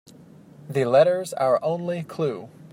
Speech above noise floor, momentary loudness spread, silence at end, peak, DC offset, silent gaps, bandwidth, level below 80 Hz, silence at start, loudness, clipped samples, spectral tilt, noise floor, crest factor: 26 dB; 11 LU; 0.05 s; -6 dBFS; under 0.1%; none; 16 kHz; -70 dBFS; 0.65 s; -23 LUFS; under 0.1%; -6 dB/octave; -48 dBFS; 18 dB